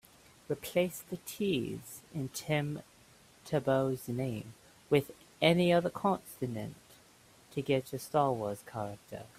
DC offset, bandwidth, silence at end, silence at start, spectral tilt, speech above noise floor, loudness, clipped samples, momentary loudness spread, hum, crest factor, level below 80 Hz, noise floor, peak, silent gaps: under 0.1%; 16 kHz; 0.1 s; 0.5 s; -5.5 dB/octave; 28 dB; -33 LUFS; under 0.1%; 15 LU; none; 24 dB; -66 dBFS; -61 dBFS; -10 dBFS; none